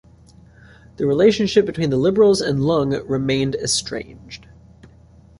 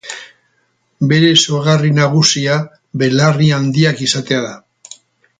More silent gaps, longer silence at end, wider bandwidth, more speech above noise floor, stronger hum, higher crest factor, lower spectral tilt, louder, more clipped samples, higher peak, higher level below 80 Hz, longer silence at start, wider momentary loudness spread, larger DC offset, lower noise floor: neither; first, 1.05 s vs 0.8 s; first, 11.5 kHz vs 9.4 kHz; second, 30 dB vs 49 dB; neither; about the same, 18 dB vs 14 dB; about the same, -5 dB/octave vs -4.5 dB/octave; second, -18 LUFS vs -13 LUFS; neither; about the same, -2 dBFS vs 0 dBFS; first, -48 dBFS vs -54 dBFS; first, 1 s vs 0.05 s; first, 18 LU vs 10 LU; neither; second, -48 dBFS vs -62 dBFS